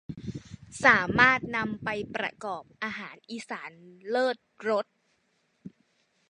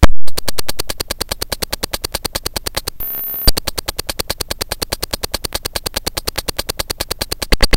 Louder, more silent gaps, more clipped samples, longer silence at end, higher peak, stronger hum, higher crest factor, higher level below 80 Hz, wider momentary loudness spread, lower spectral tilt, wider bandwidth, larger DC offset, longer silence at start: second, -27 LUFS vs -20 LUFS; neither; second, under 0.1% vs 2%; first, 0.6 s vs 0 s; second, -4 dBFS vs 0 dBFS; neither; first, 26 dB vs 14 dB; second, -60 dBFS vs -22 dBFS; first, 20 LU vs 6 LU; first, -4.5 dB/octave vs -3 dB/octave; second, 11 kHz vs 17.5 kHz; neither; about the same, 0.1 s vs 0 s